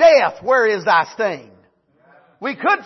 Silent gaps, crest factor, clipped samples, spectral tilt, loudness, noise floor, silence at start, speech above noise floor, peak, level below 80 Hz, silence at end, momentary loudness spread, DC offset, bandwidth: none; 16 dB; under 0.1%; -4 dB/octave; -17 LUFS; -56 dBFS; 0 s; 38 dB; -2 dBFS; -62 dBFS; 0.05 s; 13 LU; under 0.1%; 6.2 kHz